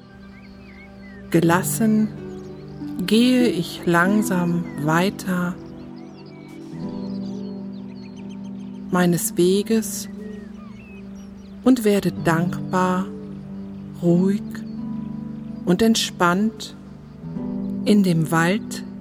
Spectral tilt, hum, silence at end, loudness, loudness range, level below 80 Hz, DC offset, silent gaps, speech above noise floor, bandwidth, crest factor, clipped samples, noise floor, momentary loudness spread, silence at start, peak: -5.5 dB/octave; none; 0 s; -21 LUFS; 6 LU; -52 dBFS; under 0.1%; none; 23 dB; 19 kHz; 18 dB; under 0.1%; -42 dBFS; 21 LU; 0.05 s; -4 dBFS